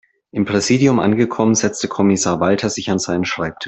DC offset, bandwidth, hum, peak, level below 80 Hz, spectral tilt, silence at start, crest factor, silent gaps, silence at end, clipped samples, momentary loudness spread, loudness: under 0.1%; 8.4 kHz; none; -2 dBFS; -52 dBFS; -4.5 dB/octave; 0.35 s; 14 dB; none; 0 s; under 0.1%; 6 LU; -17 LUFS